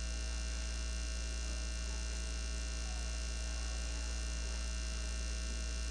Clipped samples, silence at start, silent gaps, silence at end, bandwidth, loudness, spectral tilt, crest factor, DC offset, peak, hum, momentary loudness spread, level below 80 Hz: under 0.1%; 0 s; none; 0 s; 10 kHz; -41 LUFS; -3 dB/octave; 10 dB; under 0.1%; -28 dBFS; none; 0 LU; -40 dBFS